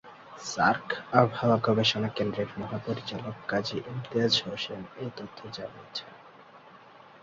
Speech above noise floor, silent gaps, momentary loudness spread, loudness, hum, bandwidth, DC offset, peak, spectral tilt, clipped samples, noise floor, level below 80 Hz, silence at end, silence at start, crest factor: 23 dB; none; 15 LU; -29 LUFS; none; 7.8 kHz; under 0.1%; -4 dBFS; -5 dB/octave; under 0.1%; -52 dBFS; -64 dBFS; 0.05 s; 0.05 s; 26 dB